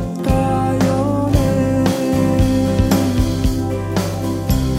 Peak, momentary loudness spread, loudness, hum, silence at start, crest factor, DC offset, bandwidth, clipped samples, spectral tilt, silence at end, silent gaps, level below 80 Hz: -2 dBFS; 5 LU; -17 LUFS; none; 0 s; 14 dB; under 0.1%; 16 kHz; under 0.1%; -7 dB/octave; 0 s; none; -26 dBFS